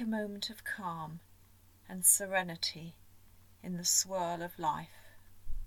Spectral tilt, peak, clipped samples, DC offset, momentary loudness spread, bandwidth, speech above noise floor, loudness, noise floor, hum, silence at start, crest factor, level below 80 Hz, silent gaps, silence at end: -2 dB/octave; -12 dBFS; under 0.1%; under 0.1%; 24 LU; 19 kHz; 27 dB; -32 LUFS; -62 dBFS; none; 0 s; 24 dB; -52 dBFS; none; 0 s